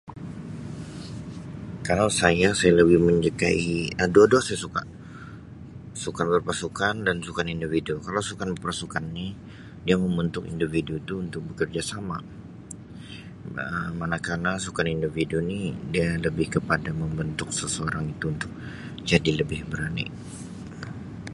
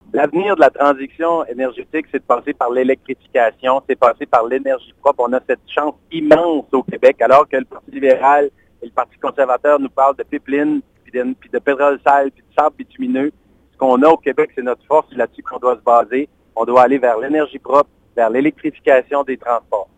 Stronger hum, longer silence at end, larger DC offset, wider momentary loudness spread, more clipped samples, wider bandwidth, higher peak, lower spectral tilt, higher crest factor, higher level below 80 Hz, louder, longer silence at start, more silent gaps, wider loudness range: neither; second, 0 s vs 0.15 s; neither; first, 19 LU vs 10 LU; neither; first, 11.5 kHz vs 9.2 kHz; about the same, -2 dBFS vs 0 dBFS; second, -5 dB/octave vs -6.5 dB/octave; first, 24 dB vs 16 dB; first, -46 dBFS vs -56 dBFS; second, -25 LUFS vs -16 LUFS; about the same, 0.05 s vs 0.15 s; neither; first, 10 LU vs 3 LU